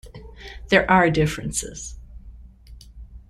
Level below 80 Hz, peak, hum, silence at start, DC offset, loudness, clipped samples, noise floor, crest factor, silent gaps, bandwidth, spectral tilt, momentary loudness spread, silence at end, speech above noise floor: -40 dBFS; -2 dBFS; none; 0.05 s; under 0.1%; -20 LUFS; under 0.1%; -45 dBFS; 22 dB; none; 14.5 kHz; -4.5 dB/octave; 24 LU; 0.1 s; 25 dB